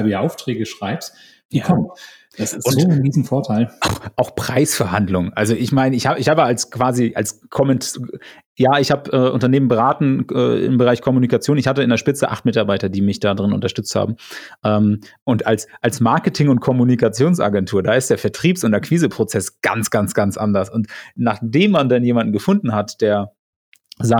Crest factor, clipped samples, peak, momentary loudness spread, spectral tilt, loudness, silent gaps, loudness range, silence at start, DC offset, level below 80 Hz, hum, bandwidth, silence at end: 14 dB; under 0.1%; -2 dBFS; 8 LU; -6 dB/octave; -17 LUFS; 1.45-1.49 s, 8.46-8.55 s, 15.22-15.26 s, 23.39-23.72 s; 3 LU; 0 s; under 0.1%; -52 dBFS; none; 19 kHz; 0 s